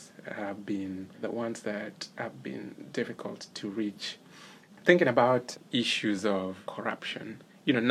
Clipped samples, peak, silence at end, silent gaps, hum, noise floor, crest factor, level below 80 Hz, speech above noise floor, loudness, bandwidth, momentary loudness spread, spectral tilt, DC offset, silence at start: under 0.1%; -6 dBFS; 0 s; none; none; -52 dBFS; 26 dB; -78 dBFS; 21 dB; -31 LUFS; 14 kHz; 16 LU; -5 dB/octave; under 0.1%; 0 s